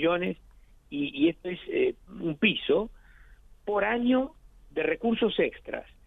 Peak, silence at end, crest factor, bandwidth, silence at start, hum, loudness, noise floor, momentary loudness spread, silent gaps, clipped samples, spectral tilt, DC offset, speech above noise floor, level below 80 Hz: -12 dBFS; 0.25 s; 18 dB; 4 kHz; 0 s; none; -28 LUFS; -53 dBFS; 13 LU; none; under 0.1%; -7.5 dB/octave; under 0.1%; 26 dB; -54 dBFS